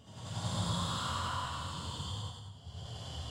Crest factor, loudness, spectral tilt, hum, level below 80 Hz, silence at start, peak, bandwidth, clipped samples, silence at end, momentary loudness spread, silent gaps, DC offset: 16 dB; -38 LUFS; -4 dB/octave; none; -52 dBFS; 0 s; -22 dBFS; 16 kHz; under 0.1%; 0 s; 12 LU; none; under 0.1%